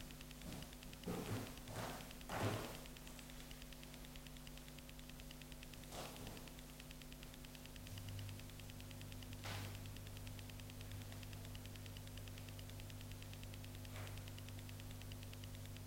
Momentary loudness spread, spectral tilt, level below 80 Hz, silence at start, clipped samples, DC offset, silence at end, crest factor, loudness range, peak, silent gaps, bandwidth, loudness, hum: 7 LU; -4.5 dB/octave; -60 dBFS; 0 s; under 0.1%; under 0.1%; 0 s; 22 dB; 6 LU; -30 dBFS; none; 16 kHz; -52 LUFS; none